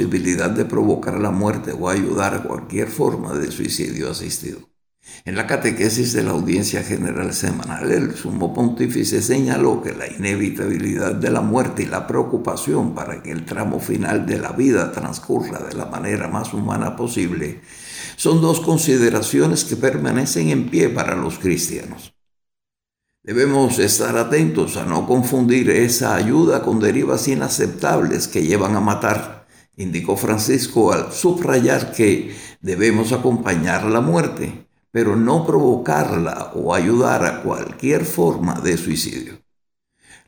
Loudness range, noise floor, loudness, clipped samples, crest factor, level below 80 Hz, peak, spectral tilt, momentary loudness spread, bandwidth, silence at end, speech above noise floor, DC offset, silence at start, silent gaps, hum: 5 LU; -85 dBFS; -19 LUFS; under 0.1%; 16 dB; -50 dBFS; -2 dBFS; -5 dB/octave; 10 LU; over 20 kHz; 0.9 s; 67 dB; under 0.1%; 0 s; none; none